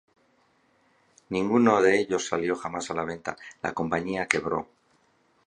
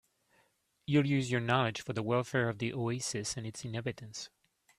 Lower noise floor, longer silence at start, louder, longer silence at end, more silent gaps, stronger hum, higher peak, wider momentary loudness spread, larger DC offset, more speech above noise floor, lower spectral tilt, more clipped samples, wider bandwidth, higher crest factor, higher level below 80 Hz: second, -66 dBFS vs -73 dBFS; first, 1.3 s vs 0.9 s; first, -26 LUFS vs -33 LUFS; first, 0.8 s vs 0.5 s; neither; neither; first, -2 dBFS vs -14 dBFS; about the same, 13 LU vs 14 LU; neither; about the same, 40 dB vs 40 dB; about the same, -5 dB/octave vs -5 dB/octave; neither; second, 10.5 kHz vs 13.5 kHz; about the same, 26 dB vs 22 dB; first, -60 dBFS vs -68 dBFS